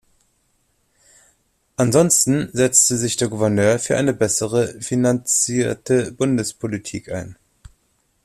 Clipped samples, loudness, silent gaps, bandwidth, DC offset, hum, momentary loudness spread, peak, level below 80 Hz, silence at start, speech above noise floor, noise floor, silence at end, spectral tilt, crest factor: under 0.1%; -18 LUFS; none; 14.5 kHz; under 0.1%; none; 14 LU; -2 dBFS; -54 dBFS; 1.8 s; 46 dB; -65 dBFS; 0.9 s; -4 dB/octave; 20 dB